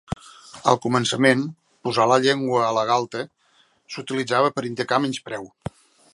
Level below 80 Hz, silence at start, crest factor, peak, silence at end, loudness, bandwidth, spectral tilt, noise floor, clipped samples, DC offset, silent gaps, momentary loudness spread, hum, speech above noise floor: -54 dBFS; 0.1 s; 22 dB; -2 dBFS; 0.65 s; -21 LUFS; 11.5 kHz; -4.5 dB/octave; -61 dBFS; under 0.1%; under 0.1%; none; 18 LU; none; 40 dB